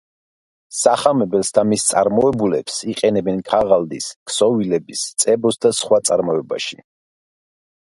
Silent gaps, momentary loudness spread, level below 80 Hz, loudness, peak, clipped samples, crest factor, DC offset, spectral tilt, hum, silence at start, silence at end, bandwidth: 4.16-4.26 s; 8 LU; -54 dBFS; -17 LUFS; 0 dBFS; under 0.1%; 18 dB; under 0.1%; -4 dB/octave; none; 0.7 s; 1.1 s; 12 kHz